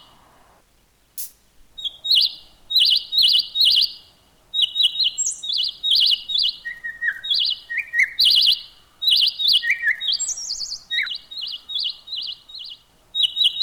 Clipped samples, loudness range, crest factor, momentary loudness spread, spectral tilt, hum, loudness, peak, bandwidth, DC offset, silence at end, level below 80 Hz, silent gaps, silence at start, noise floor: under 0.1%; 6 LU; 14 dB; 16 LU; 4 dB/octave; none; -18 LUFS; -8 dBFS; over 20 kHz; under 0.1%; 0 s; -60 dBFS; none; 1.15 s; -59 dBFS